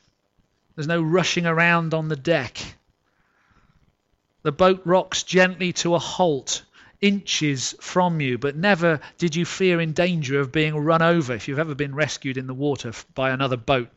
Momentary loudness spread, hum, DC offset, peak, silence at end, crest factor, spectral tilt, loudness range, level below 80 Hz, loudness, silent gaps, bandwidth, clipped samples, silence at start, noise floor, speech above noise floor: 10 LU; none; under 0.1%; -6 dBFS; 0.1 s; 16 dB; -4.5 dB/octave; 3 LU; -56 dBFS; -22 LUFS; none; 8.2 kHz; under 0.1%; 0.75 s; -69 dBFS; 47 dB